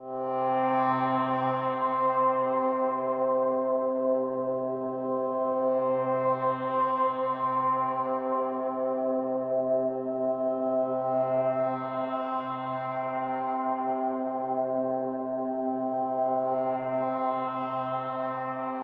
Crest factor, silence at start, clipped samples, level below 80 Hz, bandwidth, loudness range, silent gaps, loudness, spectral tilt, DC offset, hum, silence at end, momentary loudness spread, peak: 12 dB; 0 s; under 0.1%; -78 dBFS; 4.7 kHz; 3 LU; none; -28 LUFS; -9.5 dB/octave; under 0.1%; none; 0 s; 5 LU; -16 dBFS